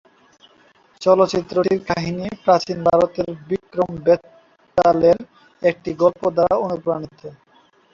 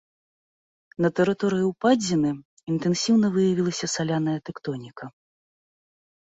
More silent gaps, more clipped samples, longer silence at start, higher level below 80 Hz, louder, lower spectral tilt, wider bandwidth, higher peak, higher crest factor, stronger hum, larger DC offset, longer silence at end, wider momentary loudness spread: second, none vs 2.45-2.57 s; neither; about the same, 1 s vs 1 s; first, -52 dBFS vs -64 dBFS; first, -19 LUFS vs -24 LUFS; about the same, -6.5 dB/octave vs -5.5 dB/octave; about the same, 7.6 kHz vs 8 kHz; first, -2 dBFS vs -8 dBFS; about the same, 18 dB vs 18 dB; neither; neither; second, 0.65 s vs 1.25 s; second, 10 LU vs 15 LU